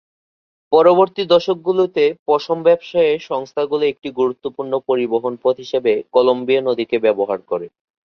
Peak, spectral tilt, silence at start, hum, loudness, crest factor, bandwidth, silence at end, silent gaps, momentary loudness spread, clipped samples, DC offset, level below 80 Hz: 0 dBFS; -6.5 dB/octave; 0.7 s; none; -17 LUFS; 16 dB; 6.6 kHz; 0.45 s; 2.19-2.26 s; 8 LU; under 0.1%; under 0.1%; -64 dBFS